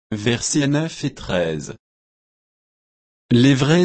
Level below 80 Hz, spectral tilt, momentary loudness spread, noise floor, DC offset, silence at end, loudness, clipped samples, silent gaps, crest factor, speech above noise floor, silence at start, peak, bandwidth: -48 dBFS; -5 dB/octave; 13 LU; under -90 dBFS; under 0.1%; 0 s; -19 LUFS; under 0.1%; 1.79-3.29 s; 16 dB; over 72 dB; 0.1 s; -4 dBFS; 8.8 kHz